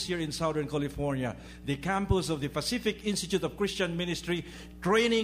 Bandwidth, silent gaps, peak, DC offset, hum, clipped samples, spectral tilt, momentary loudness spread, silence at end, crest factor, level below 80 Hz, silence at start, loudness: 15.5 kHz; none; -12 dBFS; under 0.1%; none; under 0.1%; -4.5 dB/octave; 7 LU; 0 s; 18 dB; -48 dBFS; 0 s; -31 LUFS